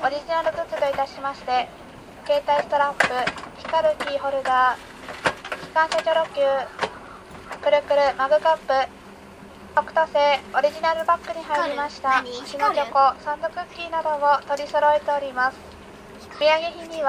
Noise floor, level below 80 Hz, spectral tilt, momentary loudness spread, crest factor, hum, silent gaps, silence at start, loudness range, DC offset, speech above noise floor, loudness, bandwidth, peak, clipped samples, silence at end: -43 dBFS; -56 dBFS; -3 dB/octave; 14 LU; 22 dB; none; none; 0 s; 2 LU; under 0.1%; 21 dB; -22 LUFS; 14 kHz; -2 dBFS; under 0.1%; 0 s